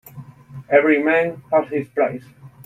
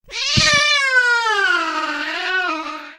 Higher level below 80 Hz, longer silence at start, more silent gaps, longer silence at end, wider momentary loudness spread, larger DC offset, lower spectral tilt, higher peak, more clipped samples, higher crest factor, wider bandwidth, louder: second, -62 dBFS vs -44 dBFS; about the same, 0.15 s vs 0.05 s; neither; about the same, 0.15 s vs 0.05 s; about the same, 11 LU vs 9 LU; neither; first, -7.5 dB/octave vs -1.5 dB/octave; about the same, -2 dBFS vs 0 dBFS; neither; about the same, 18 dB vs 18 dB; about the same, 14.5 kHz vs 15 kHz; second, -19 LUFS vs -16 LUFS